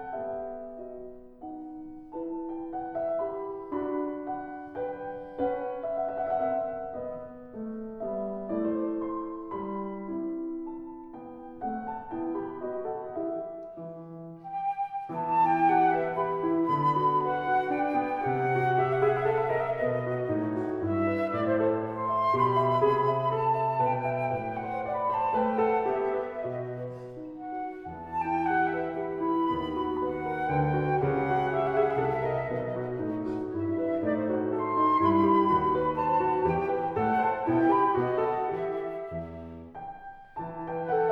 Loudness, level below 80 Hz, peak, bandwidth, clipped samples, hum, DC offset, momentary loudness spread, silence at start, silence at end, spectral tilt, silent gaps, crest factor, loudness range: -29 LUFS; -58 dBFS; -12 dBFS; 5.6 kHz; under 0.1%; none; under 0.1%; 16 LU; 0 s; 0 s; -9 dB/octave; none; 16 dB; 10 LU